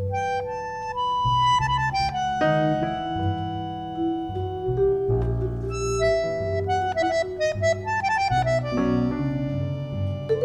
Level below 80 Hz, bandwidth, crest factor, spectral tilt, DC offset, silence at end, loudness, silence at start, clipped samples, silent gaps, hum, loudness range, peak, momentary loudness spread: -40 dBFS; 11 kHz; 14 dB; -6 dB/octave; under 0.1%; 0 s; -24 LUFS; 0 s; under 0.1%; none; none; 2 LU; -10 dBFS; 7 LU